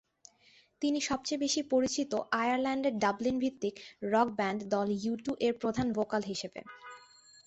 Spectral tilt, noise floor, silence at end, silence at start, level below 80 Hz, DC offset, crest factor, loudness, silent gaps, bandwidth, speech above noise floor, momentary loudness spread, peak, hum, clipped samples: -4 dB/octave; -65 dBFS; 0.45 s; 0.8 s; -66 dBFS; under 0.1%; 18 dB; -32 LUFS; none; 8.2 kHz; 33 dB; 9 LU; -14 dBFS; none; under 0.1%